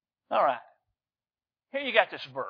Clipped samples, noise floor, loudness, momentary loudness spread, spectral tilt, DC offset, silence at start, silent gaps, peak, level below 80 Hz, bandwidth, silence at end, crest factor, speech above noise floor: under 0.1%; under -90 dBFS; -28 LUFS; 12 LU; -5 dB/octave; under 0.1%; 0.3 s; none; -4 dBFS; -86 dBFS; 5.4 kHz; 0 s; 26 dB; over 62 dB